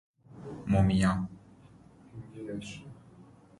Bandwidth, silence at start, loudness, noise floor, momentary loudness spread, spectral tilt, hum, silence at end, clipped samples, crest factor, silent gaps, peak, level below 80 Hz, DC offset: 11.5 kHz; 0.3 s; -30 LUFS; -56 dBFS; 23 LU; -7 dB/octave; none; 0.35 s; under 0.1%; 20 dB; none; -12 dBFS; -48 dBFS; under 0.1%